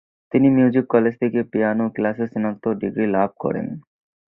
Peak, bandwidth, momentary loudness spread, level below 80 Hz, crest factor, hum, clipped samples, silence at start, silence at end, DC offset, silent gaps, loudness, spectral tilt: -2 dBFS; 4 kHz; 9 LU; -58 dBFS; 18 dB; none; under 0.1%; 0.35 s; 0.5 s; under 0.1%; none; -20 LUFS; -11.5 dB/octave